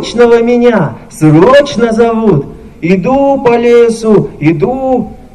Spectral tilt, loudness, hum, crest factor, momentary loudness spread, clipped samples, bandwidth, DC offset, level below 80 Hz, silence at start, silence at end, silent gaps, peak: -7 dB/octave; -8 LUFS; none; 8 dB; 7 LU; 5%; 12 kHz; 0.4%; -36 dBFS; 0 s; 0.1 s; none; 0 dBFS